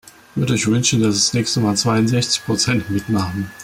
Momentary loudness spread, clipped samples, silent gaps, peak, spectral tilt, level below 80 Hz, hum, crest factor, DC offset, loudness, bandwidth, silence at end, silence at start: 6 LU; under 0.1%; none; -4 dBFS; -4 dB/octave; -48 dBFS; none; 14 dB; under 0.1%; -17 LUFS; 16 kHz; 0 s; 0.35 s